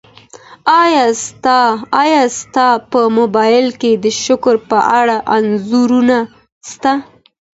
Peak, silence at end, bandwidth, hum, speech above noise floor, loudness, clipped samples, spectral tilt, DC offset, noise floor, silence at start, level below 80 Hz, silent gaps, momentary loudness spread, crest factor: 0 dBFS; 0.55 s; 8 kHz; none; 27 dB; -12 LUFS; under 0.1%; -3.5 dB/octave; under 0.1%; -39 dBFS; 0.35 s; -56 dBFS; 6.52-6.61 s; 6 LU; 12 dB